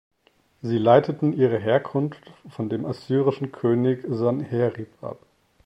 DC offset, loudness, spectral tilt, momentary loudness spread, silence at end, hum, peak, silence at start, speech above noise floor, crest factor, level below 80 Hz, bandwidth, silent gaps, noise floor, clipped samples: under 0.1%; -23 LUFS; -9 dB/octave; 17 LU; 0.5 s; none; -2 dBFS; 0.65 s; 41 dB; 22 dB; -66 dBFS; 8.4 kHz; none; -63 dBFS; under 0.1%